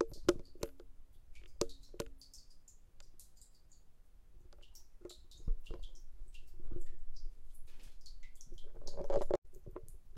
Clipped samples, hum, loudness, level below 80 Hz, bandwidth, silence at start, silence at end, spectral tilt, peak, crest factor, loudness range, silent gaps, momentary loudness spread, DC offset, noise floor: under 0.1%; none; -44 LUFS; -46 dBFS; 12.5 kHz; 0 s; 0 s; -5 dB/octave; -12 dBFS; 26 dB; 11 LU; 9.38-9.42 s; 25 LU; under 0.1%; -58 dBFS